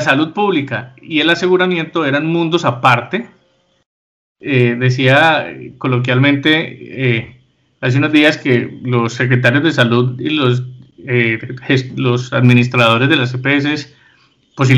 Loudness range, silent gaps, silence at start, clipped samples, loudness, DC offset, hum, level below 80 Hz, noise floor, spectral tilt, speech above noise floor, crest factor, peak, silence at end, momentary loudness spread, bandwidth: 2 LU; 3.86-4.35 s; 0 s; under 0.1%; -14 LUFS; under 0.1%; none; -56 dBFS; -57 dBFS; -6.5 dB/octave; 43 dB; 14 dB; 0 dBFS; 0 s; 10 LU; 8.4 kHz